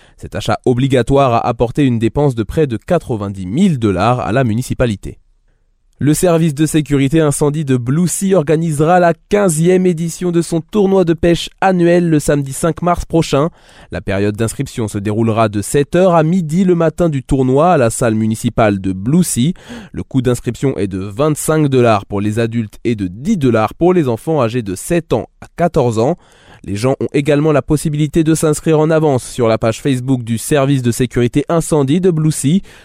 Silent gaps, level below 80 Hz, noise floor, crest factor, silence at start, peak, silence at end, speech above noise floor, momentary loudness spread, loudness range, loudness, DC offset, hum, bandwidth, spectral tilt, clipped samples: none; -36 dBFS; -55 dBFS; 12 dB; 0.2 s; -2 dBFS; 0.2 s; 42 dB; 7 LU; 3 LU; -14 LUFS; under 0.1%; none; 16 kHz; -6.5 dB/octave; under 0.1%